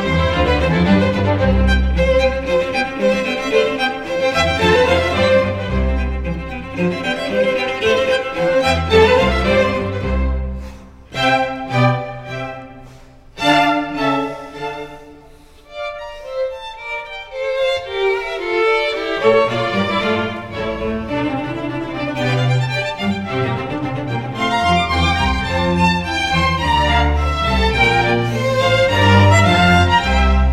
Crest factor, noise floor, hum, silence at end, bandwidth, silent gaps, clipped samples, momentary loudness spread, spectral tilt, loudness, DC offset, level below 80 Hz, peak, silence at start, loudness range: 16 dB; -43 dBFS; none; 0 s; 13.5 kHz; none; under 0.1%; 13 LU; -6 dB/octave; -16 LUFS; under 0.1%; -26 dBFS; 0 dBFS; 0 s; 6 LU